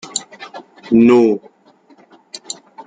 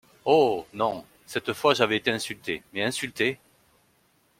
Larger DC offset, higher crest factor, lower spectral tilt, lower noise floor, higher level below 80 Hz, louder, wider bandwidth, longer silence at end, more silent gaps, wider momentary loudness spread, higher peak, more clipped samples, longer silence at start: neither; second, 16 dB vs 22 dB; about the same, -5 dB/octave vs -4 dB/octave; second, -50 dBFS vs -65 dBFS; first, -58 dBFS vs -66 dBFS; first, -14 LUFS vs -26 LUFS; second, 9.4 kHz vs 16.5 kHz; second, 0.05 s vs 1.05 s; neither; first, 25 LU vs 11 LU; about the same, -2 dBFS vs -4 dBFS; neither; second, 0.05 s vs 0.25 s